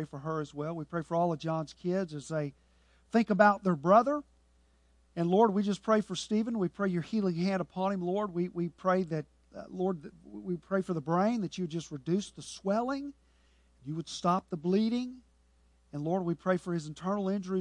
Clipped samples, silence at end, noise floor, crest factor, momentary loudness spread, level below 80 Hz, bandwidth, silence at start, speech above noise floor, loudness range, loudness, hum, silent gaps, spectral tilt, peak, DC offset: under 0.1%; 0 s; -66 dBFS; 24 dB; 13 LU; -66 dBFS; 10.5 kHz; 0 s; 35 dB; 6 LU; -31 LUFS; none; none; -6.5 dB/octave; -8 dBFS; under 0.1%